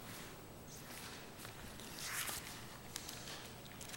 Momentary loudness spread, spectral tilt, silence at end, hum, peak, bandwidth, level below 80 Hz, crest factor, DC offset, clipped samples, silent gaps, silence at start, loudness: 11 LU; -2 dB/octave; 0 s; none; -22 dBFS; 17 kHz; -64 dBFS; 26 dB; under 0.1%; under 0.1%; none; 0 s; -47 LUFS